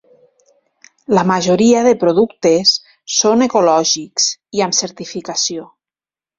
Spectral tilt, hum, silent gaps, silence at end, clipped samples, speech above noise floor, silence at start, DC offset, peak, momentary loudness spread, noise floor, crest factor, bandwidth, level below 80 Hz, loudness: -3.5 dB/octave; none; none; 0.75 s; under 0.1%; over 76 dB; 1.1 s; under 0.1%; 0 dBFS; 9 LU; under -90 dBFS; 14 dB; 7.8 kHz; -58 dBFS; -14 LUFS